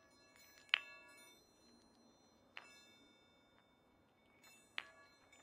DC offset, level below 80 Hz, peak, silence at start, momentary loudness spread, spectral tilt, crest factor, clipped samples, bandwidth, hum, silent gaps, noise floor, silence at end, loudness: under 0.1%; -88 dBFS; -10 dBFS; 0 s; 29 LU; 0 dB/octave; 42 dB; under 0.1%; 15.5 kHz; none; none; -73 dBFS; 0 s; -44 LUFS